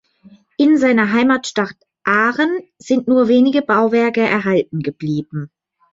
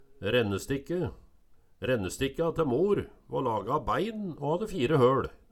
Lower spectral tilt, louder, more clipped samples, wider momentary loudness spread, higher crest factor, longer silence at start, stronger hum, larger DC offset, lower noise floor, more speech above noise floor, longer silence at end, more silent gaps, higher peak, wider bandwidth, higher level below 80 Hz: about the same, -6 dB/octave vs -6 dB/octave; first, -16 LUFS vs -29 LUFS; neither; first, 12 LU vs 9 LU; about the same, 14 dB vs 18 dB; first, 0.6 s vs 0 s; neither; neither; second, -48 dBFS vs -58 dBFS; about the same, 32 dB vs 30 dB; first, 0.5 s vs 0.2 s; neither; first, -2 dBFS vs -10 dBFS; second, 7.8 kHz vs 17 kHz; second, -60 dBFS vs -52 dBFS